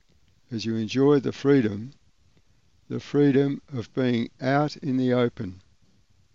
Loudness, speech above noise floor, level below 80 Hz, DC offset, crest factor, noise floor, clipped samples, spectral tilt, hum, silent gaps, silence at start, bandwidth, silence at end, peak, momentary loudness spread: -24 LUFS; 40 dB; -64 dBFS; 0.2%; 18 dB; -64 dBFS; under 0.1%; -7.5 dB/octave; none; none; 0.5 s; 7.4 kHz; 0.75 s; -8 dBFS; 15 LU